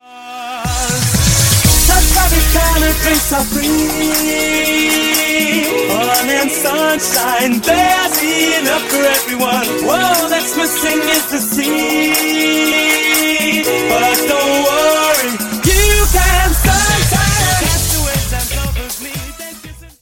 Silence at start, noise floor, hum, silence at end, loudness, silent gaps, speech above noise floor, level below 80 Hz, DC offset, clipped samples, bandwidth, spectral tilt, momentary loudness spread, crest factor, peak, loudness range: 0.1 s; -33 dBFS; none; 0.15 s; -12 LUFS; none; 20 dB; -22 dBFS; under 0.1%; under 0.1%; 17.5 kHz; -3 dB/octave; 7 LU; 14 dB; 0 dBFS; 2 LU